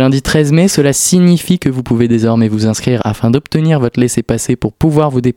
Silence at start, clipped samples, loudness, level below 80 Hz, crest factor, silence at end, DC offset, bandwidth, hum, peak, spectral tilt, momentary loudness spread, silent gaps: 0 s; 0.2%; -12 LUFS; -36 dBFS; 12 dB; 0.05 s; under 0.1%; 17 kHz; none; 0 dBFS; -5.5 dB/octave; 5 LU; none